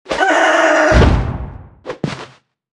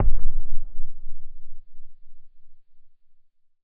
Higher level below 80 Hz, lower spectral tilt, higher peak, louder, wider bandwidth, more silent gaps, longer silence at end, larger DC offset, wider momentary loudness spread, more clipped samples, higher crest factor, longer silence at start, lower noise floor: about the same, -22 dBFS vs -26 dBFS; second, -5.5 dB/octave vs -12 dB/octave; first, 0 dBFS vs -4 dBFS; first, -13 LUFS vs -36 LUFS; first, 11 kHz vs 0.4 kHz; neither; second, 0.5 s vs 0.85 s; neither; second, 20 LU vs 24 LU; neither; about the same, 14 dB vs 12 dB; about the same, 0.1 s vs 0 s; second, -40 dBFS vs -53 dBFS